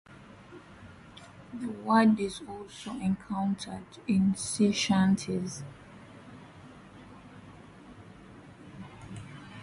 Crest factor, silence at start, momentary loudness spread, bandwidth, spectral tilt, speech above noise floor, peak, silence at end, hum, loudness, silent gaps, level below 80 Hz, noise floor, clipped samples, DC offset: 22 dB; 0.1 s; 25 LU; 11.5 kHz; -5.5 dB/octave; 22 dB; -10 dBFS; 0 s; none; -29 LUFS; none; -60 dBFS; -51 dBFS; under 0.1%; under 0.1%